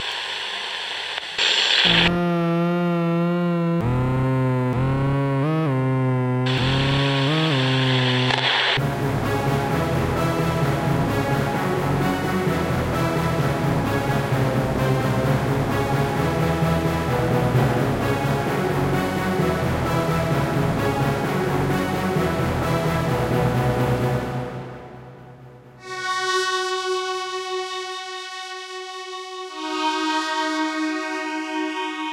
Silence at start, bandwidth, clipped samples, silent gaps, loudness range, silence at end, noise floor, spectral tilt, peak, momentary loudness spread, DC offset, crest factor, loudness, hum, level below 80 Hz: 0 s; 16 kHz; under 0.1%; none; 6 LU; 0 s; -44 dBFS; -5.5 dB/octave; -4 dBFS; 8 LU; under 0.1%; 18 dB; -21 LUFS; none; -40 dBFS